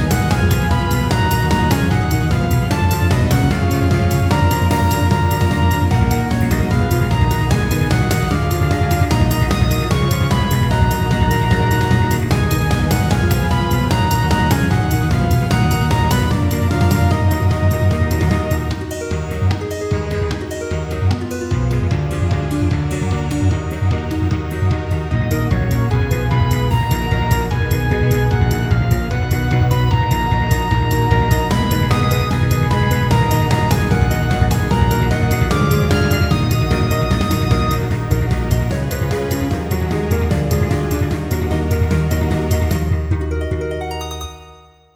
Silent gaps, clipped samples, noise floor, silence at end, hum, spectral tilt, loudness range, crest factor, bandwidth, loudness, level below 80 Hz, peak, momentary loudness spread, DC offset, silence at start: none; under 0.1%; -43 dBFS; 0.4 s; none; -6.5 dB/octave; 3 LU; 14 dB; over 20 kHz; -17 LUFS; -24 dBFS; 0 dBFS; 5 LU; under 0.1%; 0 s